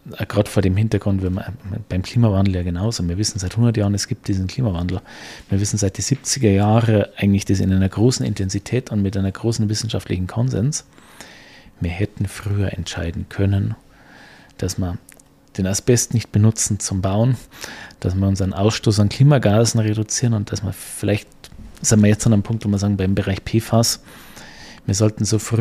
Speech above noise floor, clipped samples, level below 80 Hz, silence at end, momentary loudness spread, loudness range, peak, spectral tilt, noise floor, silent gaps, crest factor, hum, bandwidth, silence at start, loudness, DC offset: 26 dB; under 0.1%; -42 dBFS; 0 s; 12 LU; 6 LU; -2 dBFS; -5.5 dB/octave; -45 dBFS; none; 16 dB; none; 15 kHz; 0.05 s; -19 LUFS; under 0.1%